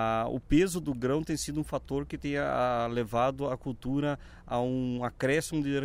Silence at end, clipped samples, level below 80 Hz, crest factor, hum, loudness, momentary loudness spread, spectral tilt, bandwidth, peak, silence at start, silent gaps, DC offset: 0 s; under 0.1%; -48 dBFS; 16 dB; none; -31 LUFS; 7 LU; -6 dB/octave; 16 kHz; -12 dBFS; 0 s; none; under 0.1%